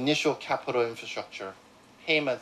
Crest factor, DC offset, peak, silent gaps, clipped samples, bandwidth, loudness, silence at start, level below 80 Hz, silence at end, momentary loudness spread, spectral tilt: 18 dB; under 0.1%; -12 dBFS; none; under 0.1%; 13.5 kHz; -29 LUFS; 0 s; -74 dBFS; 0 s; 14 LU; -4 dB/octave